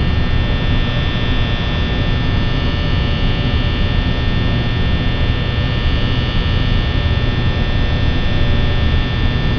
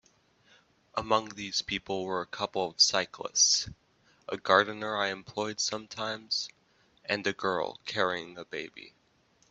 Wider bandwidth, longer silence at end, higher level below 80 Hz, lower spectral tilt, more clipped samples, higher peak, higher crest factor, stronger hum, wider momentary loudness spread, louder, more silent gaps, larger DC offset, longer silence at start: second, 5.4 kHz vs 8.4 kHz; second, 0 s vs 0.6 s; first, -18 dBFS vs -66 dBFS; first, -7.5 dB/octave vs -1 dB/octave; neither; first, -2 dBFS vs -6 dBFS; second, 12 dB vs 26 dB; neither; second, 1 LU vs 16 LU; first, -17 LUFS vs -29 LUFS; neither; neither; second, 0 s vs 0.95 s